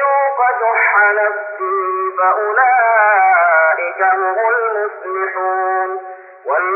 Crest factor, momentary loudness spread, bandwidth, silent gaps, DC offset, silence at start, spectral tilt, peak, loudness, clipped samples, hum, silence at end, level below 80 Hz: 14 dB; 10 LU; 2.9 kHz; none; under 0.1%; 0 s; 0 dB/octave; -2 dBFS; -14 LUFS; under 0.1%; none; 0 s; under -90 dBFS